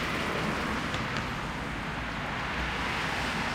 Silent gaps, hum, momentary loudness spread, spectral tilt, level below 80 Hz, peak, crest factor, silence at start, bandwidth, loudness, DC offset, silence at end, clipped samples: none; none; 4 LU; -4.5 dB/octave; -44 dBFS; -14 dBFS; 18 dB; 0 s; 16 kHz; -31 LUFS; under 0.1%; 0 s; under 0.1%